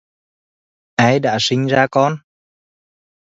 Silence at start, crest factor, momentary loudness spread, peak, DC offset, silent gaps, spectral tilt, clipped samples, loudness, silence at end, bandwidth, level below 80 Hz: 1 s; 18 dB; 7 LU; 0 dBFS; under 0.1%; none; -5 dB/octave; under 0.1%; -16 LUFS; 1.1 s; 7.8 kHz; -58 dBFS